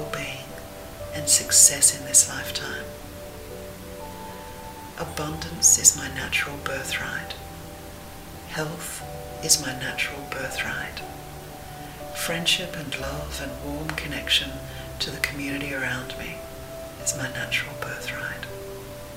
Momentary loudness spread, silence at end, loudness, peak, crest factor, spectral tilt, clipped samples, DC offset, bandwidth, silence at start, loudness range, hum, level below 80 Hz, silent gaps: 22 LU; 0 s; -23 LUFS; 0 dBFS; 28 dB; -1 dB/octave; under 0.1%; under 0.1%; 16 kHz; 0 s; 10 LU; none; -46 dBFS; none